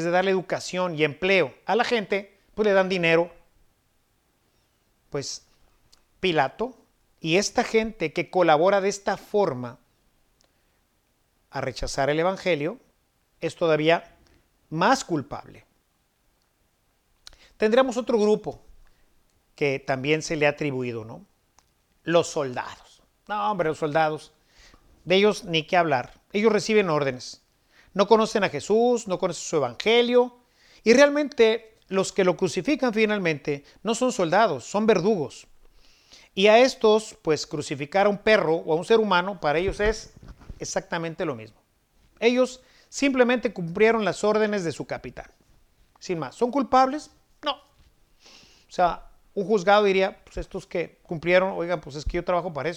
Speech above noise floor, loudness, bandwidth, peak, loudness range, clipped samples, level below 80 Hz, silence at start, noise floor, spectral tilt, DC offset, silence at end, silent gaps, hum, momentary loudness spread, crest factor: 46 dB; -23 LUFS; 12.5 kHz; -4 dBFS; 7 LU; under 0.1%; -50 dBFS; 0 s; -69 dBFS; -4.5 dB/octave; under 0.1%; 0 s; none; none; 14 LU; 20 dB